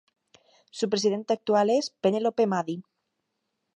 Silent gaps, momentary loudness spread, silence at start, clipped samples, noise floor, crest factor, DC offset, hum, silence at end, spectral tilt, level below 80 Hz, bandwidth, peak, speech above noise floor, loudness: none; 11 LU; 0.75 s; under 0.1%; -80 dBFS; 18 dB; under 0.1%; none; 0.95 s; -5 dB/octave; -76 dBFS; 11 kHz; -10 dBFS; 55 dB; -26 LUFS